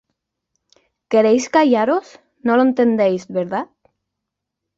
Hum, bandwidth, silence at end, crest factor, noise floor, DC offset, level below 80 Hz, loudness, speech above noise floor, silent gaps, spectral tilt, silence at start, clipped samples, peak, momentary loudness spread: none; 7.8 kHz; 1.15 s; 16 dB; -81 dBFS; under 0.1%; -66 dBFS; -17 LUFS; 65 dB; none; -5.5 dB/octave; 1.1 s; under 0.1%; -2 dBFS; 10 LU